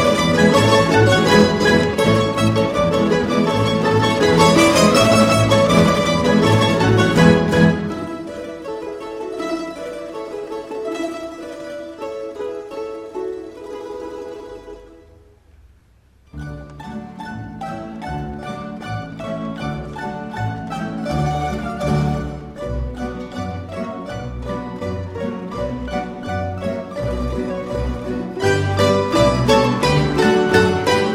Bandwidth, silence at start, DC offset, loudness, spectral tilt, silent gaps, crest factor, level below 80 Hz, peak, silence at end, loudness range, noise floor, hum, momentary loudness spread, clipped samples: 16 kHz; 0 s; under 0.1%; -18 LUFS; -5.5 dB/octave; none; 18 dB; -36 dBFS; 0 dBFS; 0 s; 18 LU; -52 dBFS; none; 17 LU; under 0.1%